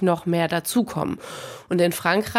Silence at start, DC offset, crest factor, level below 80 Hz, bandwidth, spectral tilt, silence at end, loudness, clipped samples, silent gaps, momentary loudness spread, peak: 0 s; under 0.1%; 18 dB; -58 dBFS; 16.5 kHz; -5 dB/octave; 0 s; -23 LUFS; under 0.1%; none; 12 LU; -4 dBFS